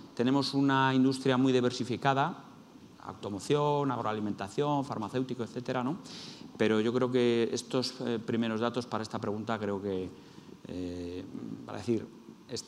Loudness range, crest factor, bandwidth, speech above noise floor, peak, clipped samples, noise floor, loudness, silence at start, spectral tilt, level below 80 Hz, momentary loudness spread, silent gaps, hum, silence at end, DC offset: 7 LU; 20 dB; 12 kHz; 22 dB; -12 dBFS; under 0.1%; -53 dBFS; -31 LUFS; 0 s; -6 dB/octave; -72 dBFS; 15 LU; none; none; 0 s; under 0.1%